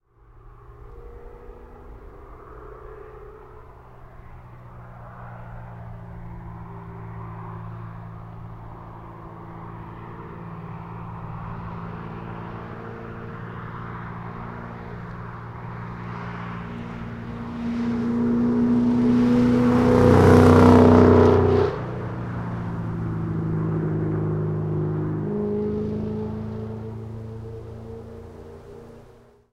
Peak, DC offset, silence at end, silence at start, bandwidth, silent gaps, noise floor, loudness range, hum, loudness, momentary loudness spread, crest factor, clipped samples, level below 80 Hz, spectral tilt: 0 dBFS; under 0.1%; 0.45 s; 0.45 s; 11 kHz; none; -51 dBFS; 26 LU; none; -21 LUFS; 26 LU; 24 dB; under 0.1%; -44 dBFS; -8.5 dB/octave